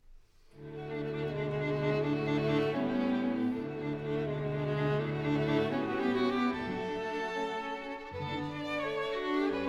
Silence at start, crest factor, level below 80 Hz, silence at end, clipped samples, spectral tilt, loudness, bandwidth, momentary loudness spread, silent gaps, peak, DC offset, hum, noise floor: 0.1 s; 16 dB; -58 dBFS; 0 s; under 0.1%; -7.5 dB/octave; -33 LUFS; 10.5 kHz; 8 LU; none; -16 dBFS; under 0.1%; none; -56 dBFS